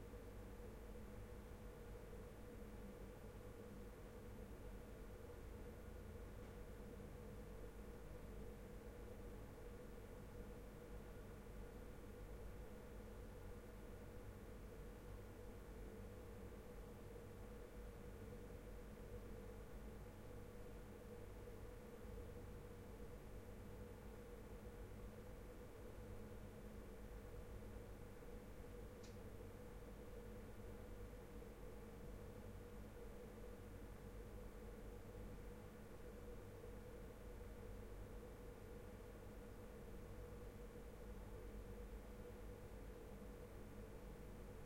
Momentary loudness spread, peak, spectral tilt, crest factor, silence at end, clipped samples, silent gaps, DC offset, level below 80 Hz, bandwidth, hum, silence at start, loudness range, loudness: 1 LU; -42 dBFS; -6.5 dB/octave; 12 dB; 0 s; under 0.1%; none; under 0.1%; -60 dBFS; 16.5 kHz; none; 0 s; 0 LU; -58 LUFS